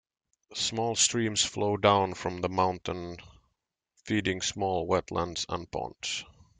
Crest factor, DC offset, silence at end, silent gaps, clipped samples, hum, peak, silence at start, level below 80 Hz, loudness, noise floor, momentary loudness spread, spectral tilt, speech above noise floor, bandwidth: 22 dB; under 0.1%; 0.3 s; none; under 0.1%; none; -8 dBFS; 0.5 s; -60 dBFS; -29 LUFS; -81 dBFS; 12 LU; -3 dB/octave; 52 dB; 9.8 kHz